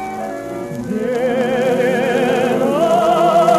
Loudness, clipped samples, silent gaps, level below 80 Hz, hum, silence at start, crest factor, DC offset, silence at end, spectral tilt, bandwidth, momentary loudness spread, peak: -16 LUFS; under 0.1%; none; -52 dBFS; none; 0 s; 14 dB; under 0.1%; 0 s; -5.5 dB/octave; 14 kHz; 12 LU; -2 dBFS